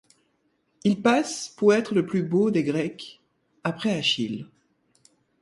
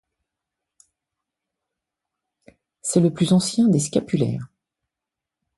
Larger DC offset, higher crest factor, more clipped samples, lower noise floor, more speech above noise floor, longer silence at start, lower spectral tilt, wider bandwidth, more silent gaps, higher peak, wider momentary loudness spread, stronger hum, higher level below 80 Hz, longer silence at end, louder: neither; about the same, 18 dB vs 20 dB; neither; second, -70 dBFS vs -86 dBFS; second, 47 dB vs 67 dB; second, 0.85 s vs 2.85 s; about the same, -5 dB/octave vs -6 dB/octave; about the same, 11.5 kHz vs 11.5 kHz; neither; second, -8 dBFS vs -4 dBFS; about the same, 11 LU vs 13 LU; neither; second, -68 dBFS vs -60 dBFS; second, 0.95 s vs 1.1 s; second, -24 LUFS vs -20 LUFS